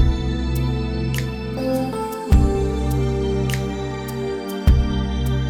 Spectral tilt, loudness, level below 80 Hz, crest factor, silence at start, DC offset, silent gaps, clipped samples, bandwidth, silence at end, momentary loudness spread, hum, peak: -7 dB/octave; -22 LUFS; -24 dBFS; 16 dB; 0 s; under 0.1%; none; under 0.1%; 16.5 kHz; 0 s; 8 LU; none; -4 dBFS